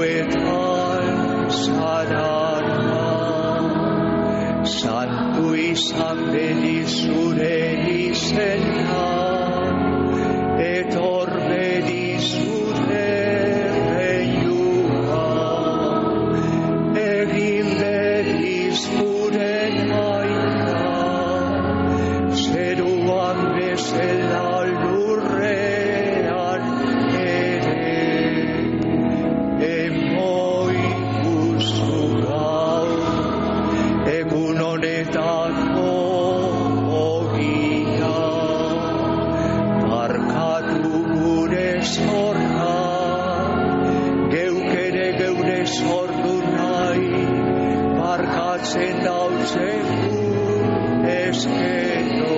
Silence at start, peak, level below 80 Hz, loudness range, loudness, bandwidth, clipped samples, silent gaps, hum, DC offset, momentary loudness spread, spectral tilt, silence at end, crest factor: 0 s; -8 dBFS; -46 dBFS; 1 LU; -20 LUFS; 8 kHz; under 0.1%; none; none; under 0.1%; 2 LU; -5 dB/octave; 0 s; 12 dB